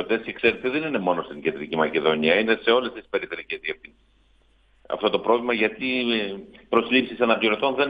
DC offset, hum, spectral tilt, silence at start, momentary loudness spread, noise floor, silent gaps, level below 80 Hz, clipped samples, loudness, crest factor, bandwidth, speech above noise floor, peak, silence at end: under 0.1%; none; -7 dB/octave; 0 s; 10 LU; -60 dBFS; none; -60 dBFS; under 0.1%; -23 LUFS; 20 dB; 5 kHz; 36 dB; -4 dBFS; 0 s